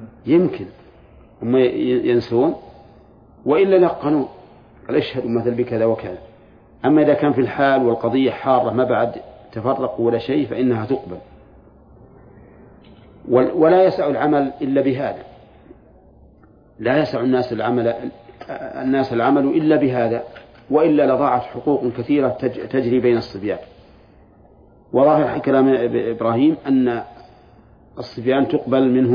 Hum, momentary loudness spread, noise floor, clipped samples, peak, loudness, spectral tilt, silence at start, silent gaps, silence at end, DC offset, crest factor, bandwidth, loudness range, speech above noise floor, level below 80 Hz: none; 13 LU; -49 dBFS; under 0.1%; -2 dBFS; -18 LUFS; -9.5 dB/octave; 0 s; none; 0 s; under 0.1%; 16 dB; 5.2 kHz; 5 LU; 32 dB; -54 dBFS